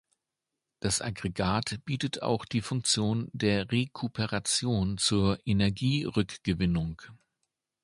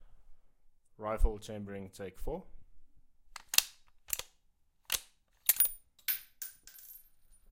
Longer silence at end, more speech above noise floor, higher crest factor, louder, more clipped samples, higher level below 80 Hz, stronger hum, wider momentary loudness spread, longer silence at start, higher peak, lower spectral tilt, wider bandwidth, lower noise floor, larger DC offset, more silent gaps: first, 0.7 s vs 0.55 s; first, 58 dB vs 35 dB; second, 20 dB vs 34 dB; first, -29 LUFS vs -34 LUFS; neither; second, -50 dBFS vs -42 dBFS; neither; second, 6 LU vs 22 LU; first, 0.85 s vs 0 s; second, -10 dBFS vs -4 dBFS; first, -4.5 dB/octave vs -1.5 dB/octave; second, 11.5 kHz vs 16.5 kHz; first, -87 dBFS vs -70 dBFS; neither; neither